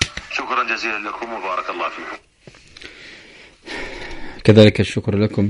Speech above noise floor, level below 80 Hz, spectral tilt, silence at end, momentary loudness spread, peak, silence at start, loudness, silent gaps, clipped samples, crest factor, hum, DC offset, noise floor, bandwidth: 28 dB; -44 dBFS; -6 dB/octave; 0 s; 26 LU; 0 dBFS; 0 s; -18 LUFS; none; under 0.1%; 20 dB; none; under 0.1%; -45 dBFS; 11 kHz